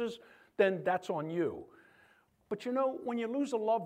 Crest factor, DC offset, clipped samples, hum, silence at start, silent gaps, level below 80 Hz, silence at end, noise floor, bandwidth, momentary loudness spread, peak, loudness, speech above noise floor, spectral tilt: 20 dB; under 0.1%; under 0.1%; none; 0 s; none; -78 dBFS; 0 s; -67 dBFS; 14.5 kHz; 14 LU; -16 dBFS; -34 LUFS; 33 dB; -6 dB/octave